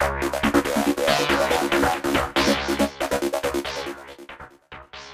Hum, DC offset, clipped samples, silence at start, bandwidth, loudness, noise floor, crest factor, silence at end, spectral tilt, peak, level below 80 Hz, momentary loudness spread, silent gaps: none; under 0.1%; under 0.1%; 0 s; 15.5 kHz; -22 LUFS; -44 dBFS; 18 dB; 0 s; -3.5 dB/octave; -6 dBFS; -42 dBFS; 20 LU; none